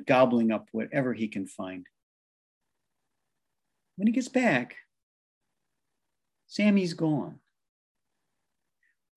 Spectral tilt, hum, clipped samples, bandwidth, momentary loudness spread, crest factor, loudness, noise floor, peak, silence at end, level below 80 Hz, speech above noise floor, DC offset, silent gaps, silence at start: -6.5 dB/octave; none; under 0.1%; 11.5 kHz; 16 LU; 22 dB; -27 LUFS; -86 dBFS; -8 dBFS; 1.8 s; -76 dBFS; 59 dB; under 0.1%; 2.03-2.61 s, 5.03-5.41 s; 0 s